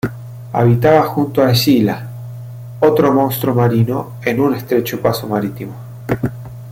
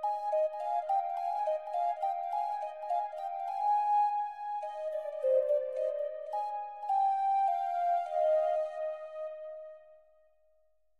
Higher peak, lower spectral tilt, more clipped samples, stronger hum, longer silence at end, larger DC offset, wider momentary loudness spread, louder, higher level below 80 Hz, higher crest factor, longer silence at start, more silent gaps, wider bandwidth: first, -2 dBFS vs -18 dBFS; first, -6.5 dB/octave vs -1 dB/octave; neither; neither; second, 0 s vs 1.05 s; neither; first, 18 LU vs 10 LU; first, -15 LUFS vs -32 LUFS; first, -46 dBFS vs -84 dBFS; about the same, 14 dB vs 14 dB; about the same, 0.05 s vs 0 s; neither; first, 16.5 kHz vs 9 kHz